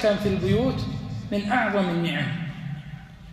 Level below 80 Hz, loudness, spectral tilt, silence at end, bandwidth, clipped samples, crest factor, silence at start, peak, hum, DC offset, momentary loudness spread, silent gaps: -46 dBFS; -25 LUFS; -7 dB/octave; 0 s; 13.5 kHz; under 0.1%; 16 dB; 0 s; -10 dBFS; none; under 0.1%; 13 LU; none